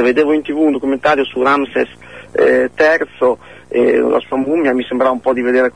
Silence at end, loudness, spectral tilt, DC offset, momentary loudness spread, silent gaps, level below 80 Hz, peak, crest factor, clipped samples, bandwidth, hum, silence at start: 0.05 s; -14 LUFS; -5.5 dB/octave; 0.4%; 6 LU; none; -52 dBFS; -2 dBFS; 12 dB; under 0.1%; 10 kHz; none; 0 s